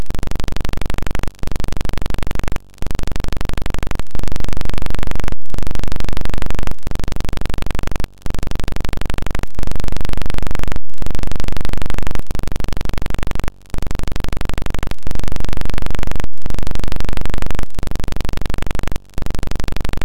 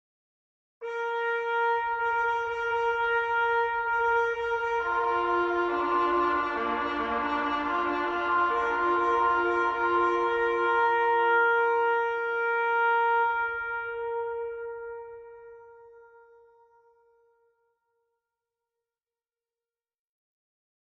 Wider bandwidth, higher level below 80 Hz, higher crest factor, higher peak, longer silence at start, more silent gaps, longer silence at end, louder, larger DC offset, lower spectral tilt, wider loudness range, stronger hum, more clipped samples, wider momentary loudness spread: first, 11.5 kHz vs 7.4 kHz; first, -20 dBFS vs -60 dBFS; about the same, 10 dB vs 14 dB; first, -2 dBFS vs -14 dBFS; second, 0 s vs 0.8 s; neither; second, 0 s vs 5 s; about the same, -26 LUFS vs -26 LUFS; first, 20% vs under 0.1%; about the same, -5.5 dB/octave vs -5 dB/octave; second, 0 LU vs 9 LU; neither; neither; second, 3 LU vs 9 LU